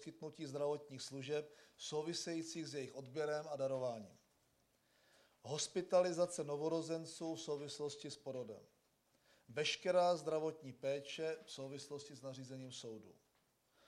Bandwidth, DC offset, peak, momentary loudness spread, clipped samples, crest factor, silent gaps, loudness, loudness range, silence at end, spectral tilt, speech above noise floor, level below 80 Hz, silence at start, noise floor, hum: 13 kHz; under 0.1%; -22 dBFS; 15 LU; under 0.1%; 20 dB; none; -43 LUFS; 5 LU; 0.75 s; -4 dB/octave; 37 dB; -88 dBFS; 0 s; -79 dBFS; none